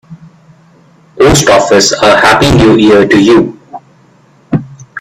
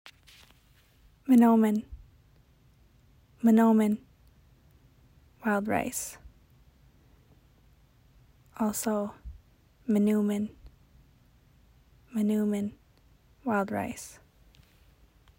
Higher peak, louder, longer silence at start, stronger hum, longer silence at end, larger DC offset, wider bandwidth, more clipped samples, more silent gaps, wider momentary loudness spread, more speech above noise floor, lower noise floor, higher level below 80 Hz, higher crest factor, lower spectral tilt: first, 0 dBFS vs -12 dBFS; first, -6 LUFS vs -27 LUFS; about the same, 0.1 s vs 0.05 s; neither; second, 0 s vs 1.3 s; neither; about the same, 15.5 kHz vs 16 kHz; first, 0.3% vs under 0.1%; neither; second, 12 LU vs 20 LU; about the same, 39 dB vs 36 dB; second, -44 dBFS vs -62 dBFS; first, -30 dBFS vs -58 dBFS; second, 8 dB vs 18 dB; second, -4.5 dB/octave vs -6 dB/octave